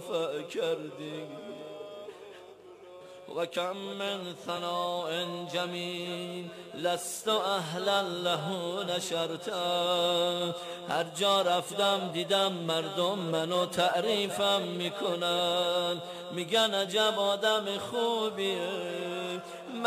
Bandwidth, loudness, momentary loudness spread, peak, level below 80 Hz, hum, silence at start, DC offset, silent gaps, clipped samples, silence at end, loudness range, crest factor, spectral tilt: 15.5 kHz; -30 LUFS; 14 LU; -14 dBFS; -78 dBFS; none; 0 s; under 0.1%; none; under 0.1%; 0 s; 9 LU; 16 dB; -3.5 dB/octave